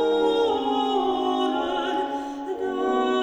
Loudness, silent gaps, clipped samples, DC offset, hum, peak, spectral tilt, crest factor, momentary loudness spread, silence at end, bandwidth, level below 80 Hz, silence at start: -24 LUFS; none; under 0.1%; under 0.1%; none; -10 dBFS; -4 dB/octave; 14 dB; 8 LU; 0 s; 9.4 kHz; -58 dBFS; 0 s